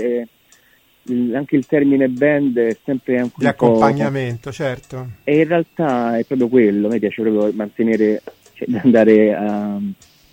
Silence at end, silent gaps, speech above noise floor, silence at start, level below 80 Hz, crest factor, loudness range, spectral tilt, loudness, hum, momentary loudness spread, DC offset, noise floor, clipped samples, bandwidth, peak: 0.4 s; none; 38 dB; 0 s; -56 dBFS; 16 dB; 2 LU; -8 dB/octave; -17 LUFS; none; 11 LU; under 0.1%; -54 dBFS; under 0.1%; 16.5 kHz; 0 dBFS